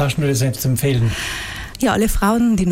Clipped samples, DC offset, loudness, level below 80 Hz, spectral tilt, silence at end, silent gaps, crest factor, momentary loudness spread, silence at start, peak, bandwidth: under 0.1%; under 0.1%; -18 LUFS; -30 dBFS; -5.5 dB/octave; 0 s; none; 16 dB; 8 LU; 0 s; -2 dBFS; 17 kHz